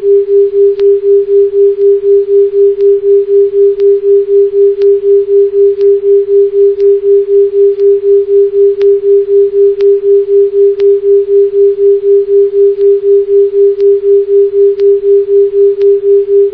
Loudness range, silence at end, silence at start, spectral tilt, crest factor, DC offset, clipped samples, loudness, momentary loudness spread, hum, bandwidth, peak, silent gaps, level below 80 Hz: 0 LU; 0 s; 0 s; -9 dB/octave; 6 dB; under 0.1%; under 0.1%; -7 LUFS; 2 LU; none; 3.2 kHz; 0 dBFS; none; -50 dBFS